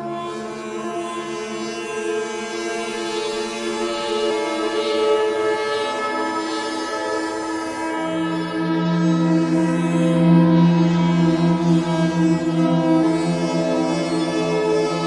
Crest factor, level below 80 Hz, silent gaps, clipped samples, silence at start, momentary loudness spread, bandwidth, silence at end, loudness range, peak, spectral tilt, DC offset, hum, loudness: 16 dB; -56 dBFS; none; under 0.1%; 0 s; 10 LU; 11.5 kHz; 0 s; 8 LU; -4 dBFS; -6.5 dB/octave; under 0.1%; none; -20 LUFS